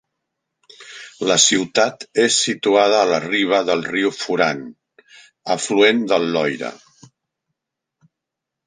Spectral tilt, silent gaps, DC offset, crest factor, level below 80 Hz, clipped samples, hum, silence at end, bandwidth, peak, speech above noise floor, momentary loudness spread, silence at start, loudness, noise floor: -2 dB/octave; none; under 0.1%; 20 dB; -66 dBFS; under 0.1%; none; 1.9 s; 10 kHz; 0 dBFS; 65 dB; 16 LU; 0.8 s; -17 LUFS; -83 dBFS